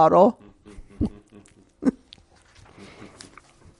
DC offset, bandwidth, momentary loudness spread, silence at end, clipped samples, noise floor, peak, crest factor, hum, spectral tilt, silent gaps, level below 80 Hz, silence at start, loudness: under 0.1%; 11.5 kHz; 28 LU; 1.9 s; under 0.1%; -54 dBFS; -2 dBFS; 22 dB; none; -8 dB/octave; none; -46 dBFS; 0 s; -23 LUFS